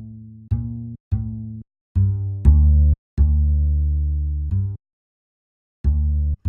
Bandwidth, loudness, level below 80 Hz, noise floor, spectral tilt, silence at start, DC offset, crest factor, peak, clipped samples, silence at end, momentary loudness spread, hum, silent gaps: 1.2 kHz; -21 LUFS; -22 dBFS; -38 dBFS; -12 dB/octave; 0 s; under 0.1%; 18 dB; -2 dBFS; under 0.1%; 0 s; 17 LU; none; 1.00-1.11 s, 1.81-1.95 s, 2.98-3.17 s, 4.93-5.84 s